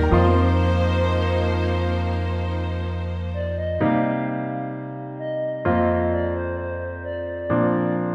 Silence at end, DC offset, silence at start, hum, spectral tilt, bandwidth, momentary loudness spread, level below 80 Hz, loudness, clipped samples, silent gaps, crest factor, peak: 0 s; under 0.1%; 0 s; none; -8.5 dB/octave; 6.6 kHz; 10 LU; -34 dBFS; -23 LUFS; under 0.1%; none; 16 dB; -4 dBFS